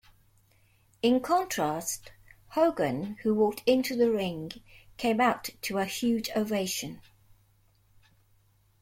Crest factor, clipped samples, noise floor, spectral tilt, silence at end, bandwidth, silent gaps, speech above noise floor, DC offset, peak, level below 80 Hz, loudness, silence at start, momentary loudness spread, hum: 18 dB; under 0.1%; -65 dBFS; -4.5 dB/octave; 1.8 s; 16.5 kHz; none; 37 dB; under 0.1%; -12 dBFS; -62 dBFS; -28 LUFS; 1.05 s; 10 LU; none